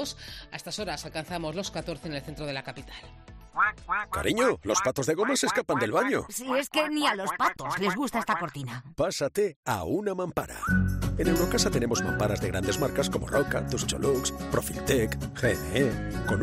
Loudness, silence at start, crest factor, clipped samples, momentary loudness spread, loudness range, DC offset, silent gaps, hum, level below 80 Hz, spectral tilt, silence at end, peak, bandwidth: -28 LUFS; 0 s; 16 dB; under 0.1%; 10 LU; 5 LU; under 0.1%; 9.56-9.63 s; none; -44 dBFS; -4.5 dB/octave; 0 s; -12 dBFS; 16 kHz